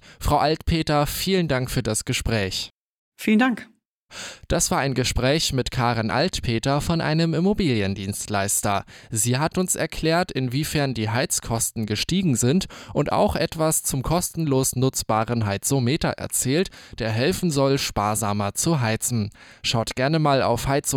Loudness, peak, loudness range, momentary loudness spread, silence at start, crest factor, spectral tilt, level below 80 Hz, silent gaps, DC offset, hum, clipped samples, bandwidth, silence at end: -22 LUFS; -8 dBFS; 1 LU; 6 LU; 0.05 s; 14 dB; -4.5 dB/octave; -40 dBFS; 2.70-3.12 s, 3.85-4.09 s; under 0.1%; none; under 0.1%; 18 kHz; 0 s